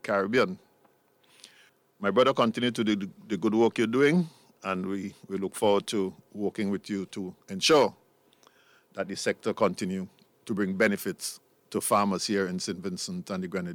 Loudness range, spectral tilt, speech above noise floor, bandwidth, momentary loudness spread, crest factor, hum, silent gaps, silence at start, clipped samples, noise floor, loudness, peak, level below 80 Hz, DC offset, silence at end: 4 LU; -4.5 dB/octave; 37 dB; 17.5 kHz; 13 LU; 18 dB; none; none; 0.05 s; under 0.1%; -65 dBFS; -28 LUFS; -10 dBFS; -72 dBFS; under 0.1%; 0 s